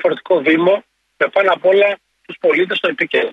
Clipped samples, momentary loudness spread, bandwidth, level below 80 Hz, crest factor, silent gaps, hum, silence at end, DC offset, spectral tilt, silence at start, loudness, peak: under 0.1%; 7 LU; 6.6 kHz; -68 dBFS; 14 dB; none; none; 0 s; under 0.1%; -6 dB/octave; 0 s; -15 LUFS; -2 dBFS